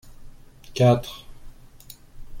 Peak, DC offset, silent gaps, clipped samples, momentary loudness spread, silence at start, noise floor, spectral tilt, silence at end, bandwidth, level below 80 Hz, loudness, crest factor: -6 dBFS; under 0.1%; none; under 0.1%; 26 LU; 0.05 s; -46 dBFS; -7 dB/octave; 0 s; 16.5 kHz; -44 dBFS; -21 LUFS; 20 dB